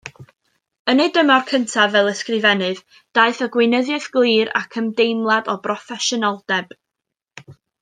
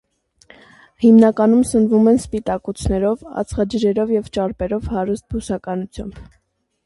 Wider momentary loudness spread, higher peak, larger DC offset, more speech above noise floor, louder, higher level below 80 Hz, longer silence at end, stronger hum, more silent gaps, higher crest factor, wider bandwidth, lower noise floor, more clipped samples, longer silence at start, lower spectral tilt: second, 8 LU vs 13 LU; about the same, -2 dBFS vs -2 dBFS; neither; first, 65 dB vs 34 dB; about the same, -18 LUFS vs -17 LUFS; second, -70 dBFS vs -38 dBFS; second, 0.3 s vs 0.65 s; neither; first, 0.79-0.85 s vs none; about the same, 18 dB vs 16 dB; second, 9.8 kHz vs 11.5 kHz; first, -82 dBFS vs -51 dBFS; neither; second, 0.05 s vs 1 s; second, -3.5 dB/octave vs -7 dB/octave